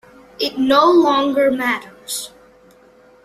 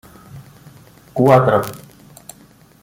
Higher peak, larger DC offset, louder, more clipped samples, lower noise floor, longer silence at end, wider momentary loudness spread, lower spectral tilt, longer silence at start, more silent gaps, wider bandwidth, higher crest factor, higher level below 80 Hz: about the same, -2 dBFS vs -2 dBFS; neither; about the same, -16 LUFS vs -15 LUFS; neither; about the same, -49 dBFS vs -48 dBFS; about the same, 0.95 s vs 1.05 s; second, 14 LU vs 27 LU; second, -3 dB/octave vs -7.5 dB/octave; about the same, 0.4 s vs 0.35 s; neither; second, 15 kHz vs 17 kHz; about the same, 16 dB vs 18 dB; about the same, -58 dBFS vs -54 dBFS